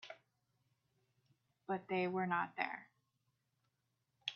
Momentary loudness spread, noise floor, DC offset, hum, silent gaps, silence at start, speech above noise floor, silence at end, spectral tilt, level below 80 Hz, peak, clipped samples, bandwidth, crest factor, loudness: 19 LU; -85 dBFS; under 0.1%; none; none; 0 s; 45 dB; 0 s; -3 dB/octave; -90 dBFS; -20 dBFS; under 0.1%; 6.8 kHz; 24 dB; -40 LUFS